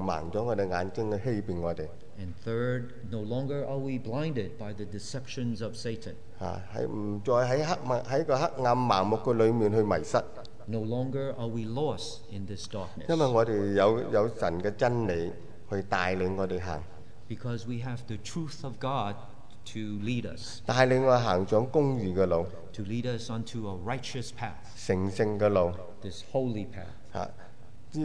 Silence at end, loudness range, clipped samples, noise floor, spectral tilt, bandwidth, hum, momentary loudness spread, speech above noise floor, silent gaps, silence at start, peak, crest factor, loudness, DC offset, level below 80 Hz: 0 s; 7 LU; under 0.1%; -52 dBFS; -6.5 dB/octave; 10.5 kHz; none; 15 LU; 23 dB; none; 0 s; -8 dBFS; 20 dB; -30 LUFS; 1%; -56 dBFS